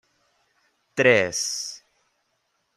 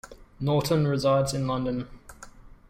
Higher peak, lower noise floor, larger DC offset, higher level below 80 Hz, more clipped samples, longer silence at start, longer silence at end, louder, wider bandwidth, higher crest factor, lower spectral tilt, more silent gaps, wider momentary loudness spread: first, -4 dBFS vs -12 dBFS; first, -73 dBFS vs -48 dBFS; neither; second, -68 dBFS vs -48 dBFS; neither; first, 0.95 s vs 0.05 s; first, 1 s vs 0.15 s; first, -22 LUFS vs -26 LUFS; second, 14.5 kHz vs 16 kHz; first, 24 dB vs 16 dB; second, -2.5 dB/octave vs -6.5 dB/octave; neither; first, 16 LU vs 10 LU